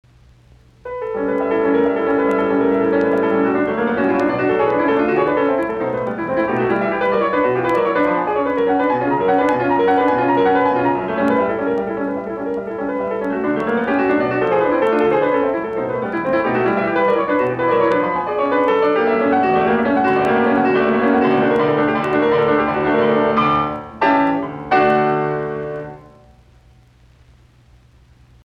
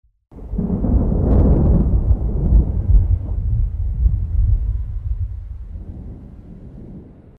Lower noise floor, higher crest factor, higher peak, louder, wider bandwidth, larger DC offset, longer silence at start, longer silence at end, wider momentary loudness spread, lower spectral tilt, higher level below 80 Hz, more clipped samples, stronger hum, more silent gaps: first, -49 dBFS vs -38 dBFS; about the same, 14 dB vs 14 dB; about the same, -4 dBFS vs -4 dBFS; about the same, -17 LUFS vs -19 LUFS; first, 7.4 kHz vs 1.8 kHz; neither; first, 0.85 s vs 0.35 s; first, 2.45 s vs 0.25 s; second, 7 LU vs 22 LU; second, -8 dB/octave vs -13 dB/octave; second, -50 dBFS vs -20 dBFS; neither; neither; neither